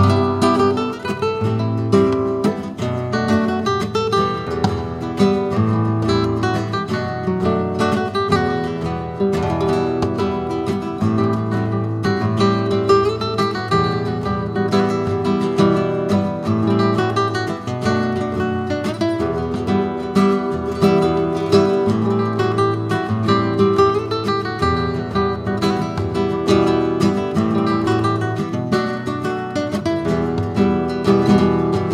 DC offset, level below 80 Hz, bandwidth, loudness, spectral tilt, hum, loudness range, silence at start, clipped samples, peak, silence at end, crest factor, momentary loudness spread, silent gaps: under 0.1%; -42 dBFS; 13.5 kHz; -19 LUFS; -7 dB/octave; none; 2 LU; 0 s; under 0.1%; -2 dBFS; 0 s; 16 dB; 6 LU; none